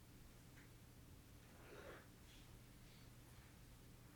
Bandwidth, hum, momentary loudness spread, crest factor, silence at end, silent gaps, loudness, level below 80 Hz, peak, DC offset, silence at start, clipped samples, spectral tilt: over 20 kHz; none; 5 LU; 16 dB; 0 s; none; -63 LUFS; -68 dBFS; -46 dBFS; under 0.1%; 0 s; under 0.1%; -4.5 dB/octave